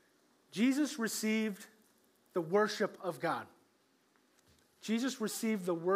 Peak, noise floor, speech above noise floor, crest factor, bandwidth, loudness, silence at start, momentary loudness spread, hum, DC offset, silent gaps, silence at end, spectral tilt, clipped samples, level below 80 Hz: -18 dBFS; -72 dBFS; 38 dB; 18 dB; 16 kHz; -35 LUFS; 0.55 s; 15 LU; none; under 0.1%; none; 0 s; -4.5 dB/octave; under 0.1%; under -90 dBFS